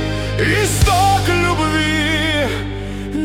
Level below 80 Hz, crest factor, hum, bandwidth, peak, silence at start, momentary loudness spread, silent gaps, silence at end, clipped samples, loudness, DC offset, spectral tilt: -26 dBFS; 14 dB; 50 Hz at -30 dBFS; 17.5 kHz; -2 dBFS; 0 s; 10 LU; none; 0 s; under 0.1%; -16 LUFS; under 0.1%; -4.5 dB/octave